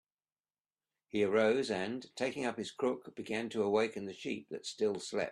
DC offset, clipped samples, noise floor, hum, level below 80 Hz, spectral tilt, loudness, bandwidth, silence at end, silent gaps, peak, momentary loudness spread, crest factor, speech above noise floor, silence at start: under 0.1%; under 0.1%; under -90 dBFS; none; -76 dBFS; -4.5 dB/octave; -35 LUFS; 11.5 kHz; 0 s; none; -16 dBFS; 11 LU; 20 dB; over 55 dB; 1.15 s